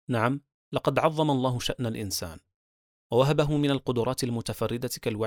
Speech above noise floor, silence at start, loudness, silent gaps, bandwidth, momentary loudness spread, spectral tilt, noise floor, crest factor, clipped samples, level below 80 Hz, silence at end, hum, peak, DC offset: over 63 dB; 0.1 s; -27 LUFS; 0.54-0.72 s, 2.54-3.10 s; 19.5 kHz; 8 LU; -5.5 dB/octave; under -90 dBFS; 20 dB; under 0.1%; -52 dBFS; 0 s; none; -8 dBFS; under 0.1%